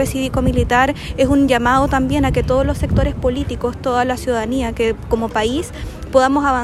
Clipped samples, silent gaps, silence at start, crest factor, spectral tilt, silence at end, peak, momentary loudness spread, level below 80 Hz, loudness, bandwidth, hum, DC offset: under 0.1%; none; 0 s; 16 dB; -6 dB/octave; 0 s; 0 dBFS; 7 LU; -28 dBFS; -17 LUFS; 14 kHz; none; under 0.1%